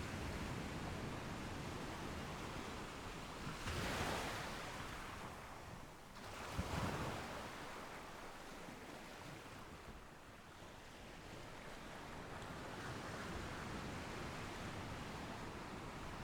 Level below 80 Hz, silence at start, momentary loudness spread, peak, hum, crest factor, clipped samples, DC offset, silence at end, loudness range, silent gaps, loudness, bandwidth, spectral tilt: -58 dBFS; 0 s; 11 LU; -28 dBFS; none; 20 dB; under 0.1%; under 0.1%; 0 s; 8 LU; none; -48 LUFS; over 20 kHz; -4.5 dB/octave